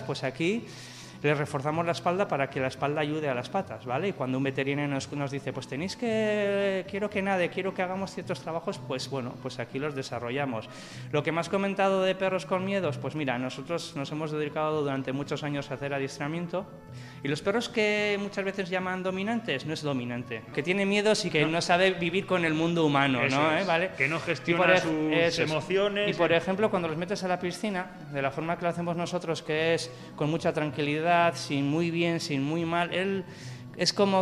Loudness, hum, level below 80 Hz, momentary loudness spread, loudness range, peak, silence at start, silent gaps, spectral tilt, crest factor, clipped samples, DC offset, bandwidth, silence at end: -28 LUFS; none; -64 dBFS; 10 LU; 7 LU; -8 dBFS; 0 s; none; -5 dB/octave; 20 dB; under 0.1%; under 0.1%; 13 kHz; 0 s